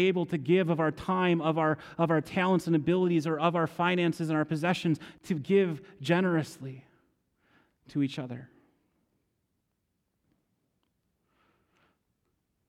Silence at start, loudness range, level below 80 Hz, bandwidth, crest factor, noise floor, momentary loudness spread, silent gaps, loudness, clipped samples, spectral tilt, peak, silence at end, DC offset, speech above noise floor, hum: 0 s; 13 LU; -68 dBFS; 13 kHz; 20 dB; -79 dBFS; 10 LU; none; -28 LUFS; under 0.1%; -7 dB/octave; -10 dBFS; 4.25 s; under 0.1%; 52 dB; none